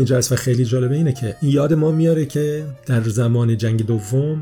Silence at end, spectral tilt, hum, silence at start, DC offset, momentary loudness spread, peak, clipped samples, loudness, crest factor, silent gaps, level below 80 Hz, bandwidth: 0 s; -6.5 dB/octave; none; 0 s; under 0.1%; 5 LU; -6 dBFS; under 0.1%; -18 LUFS; 12 dB; none; -50 dBFS; 17.5 kHz